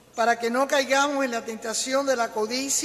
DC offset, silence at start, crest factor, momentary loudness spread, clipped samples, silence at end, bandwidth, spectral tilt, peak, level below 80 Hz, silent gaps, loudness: under 0.1%; 0.15 s; 16 dB; 6 LU; under 0.1%; 0 s; 14.5 kHz; -1 dB/octave; -8 dBFS; -70 dBFS; none; -24 LUFS